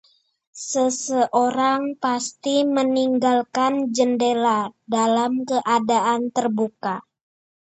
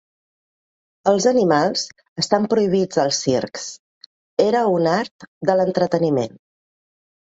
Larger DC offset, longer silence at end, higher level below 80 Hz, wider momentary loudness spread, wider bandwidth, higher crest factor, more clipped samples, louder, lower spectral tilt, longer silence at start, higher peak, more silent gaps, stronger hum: neither; second, 0.7 s vs 1.1 s; second, -72 dBFS vs -62 dBFS; second, 6 LU vs 12 LU; about the same, 8.8 kHz vs 8 kHz; about the same, 16 dB vs 18 dB; neither; about the same, -21 LUFS vs -19 LUFS; about the same, -3.5 dB/octave vs -4.5 dB/octave; second, 0.55 s vs 1.05 s; second, -6 dBFS vs -2 dBFS; second, none vs 2.08-2.16 s, 3.79-4.37 s, 5.11-5.19 s, 5.28-5.41 s; neither